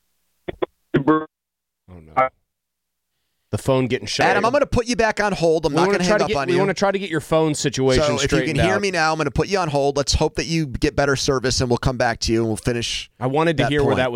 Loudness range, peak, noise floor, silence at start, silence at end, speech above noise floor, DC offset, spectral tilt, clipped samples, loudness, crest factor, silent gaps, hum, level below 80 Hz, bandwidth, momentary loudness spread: 6 LU; -4 dBFS; -84 dBFS; 0.5 s; 0 s; 64 dB; under 0.1%; -4.5 dB/octave; under 0.1%; -20 LUFS; 16 dB; none; none; -38 dBFS; 16 kHz; 6 LU